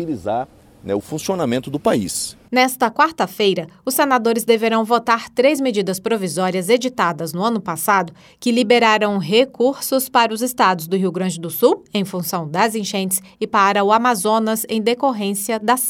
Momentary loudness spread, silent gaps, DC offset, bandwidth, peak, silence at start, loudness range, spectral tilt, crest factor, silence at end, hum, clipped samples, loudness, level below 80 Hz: 8 LU; none; under 0.1%; 18 kHz; -2 dBFS; 0 s; 2 LU; -4 dB/octave; 16 dB; 0 s; none; under 0.1%; -18 LUFS; -60 dBFS